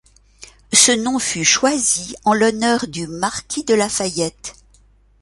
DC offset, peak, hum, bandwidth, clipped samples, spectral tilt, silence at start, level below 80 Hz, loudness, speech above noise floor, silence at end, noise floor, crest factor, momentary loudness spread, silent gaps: under 0.1%; 0 dBFS; none; 12 kHz; under 0.1%; -2 dB/octave; 0.4 s; -50 dBFS; -17 LUFS; 35 dB; 0.7 s; -52 dBFS; 20 dB; 12 LU; none